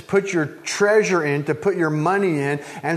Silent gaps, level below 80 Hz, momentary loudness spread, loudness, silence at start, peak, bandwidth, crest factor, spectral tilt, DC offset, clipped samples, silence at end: none; -64 dBFS; 7 LU; -20 LUFS; 0 s; -4 dBFS; 13.5 kHz; 16 dB; -5.5 dB/octave; under 0.1%; under 0.1%; 0 s